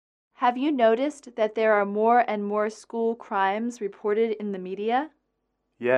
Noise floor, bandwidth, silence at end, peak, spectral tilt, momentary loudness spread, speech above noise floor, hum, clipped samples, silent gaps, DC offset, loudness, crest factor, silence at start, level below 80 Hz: -76 dBFS; 10.5 kHz; 0 s; -8 dBFS; -5.5 dB/octave; 10 LU; 52 dB; none; under 0.1%; none; under 0.1%; -25 LUFS; 18 dB; 0.4 s; -78 dBFS